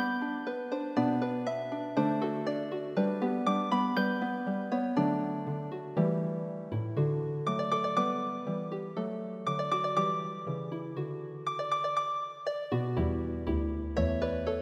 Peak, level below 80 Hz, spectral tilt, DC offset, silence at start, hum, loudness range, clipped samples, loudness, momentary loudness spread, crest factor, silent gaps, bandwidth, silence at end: -14 dBFS; -46 dBFS; -7.5 dB/octave; under 0.1%; 0 s; none; 3 LU; under 0.1%; -32 LUFS; 7 LU; 18 dB; none; 11.5 kHz; 0 s